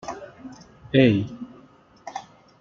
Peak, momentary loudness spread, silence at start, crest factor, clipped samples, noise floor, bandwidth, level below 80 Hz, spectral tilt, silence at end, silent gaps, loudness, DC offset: -4 dBFS; 25 LU; 0.05 s; 22 dB; under 0.1%; -52 dBFS; 7.2 kHz; -56 dBFS; -7 dB/octave; 0.4 s; none; -21 LUFS; under 0.1%